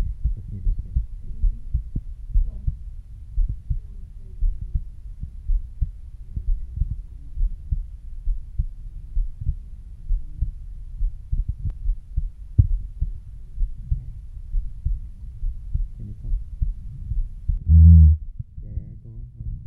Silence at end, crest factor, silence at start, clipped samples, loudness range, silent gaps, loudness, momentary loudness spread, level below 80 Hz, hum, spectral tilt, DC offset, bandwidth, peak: 0 s; 20 dB; 0 s; under 0.1%; 13 LU; none; -26 LUFS; 16 LU; -26 dBFS; none; -12 dB/octave; under 0.1%; 0.6 kHz; -2 dBFS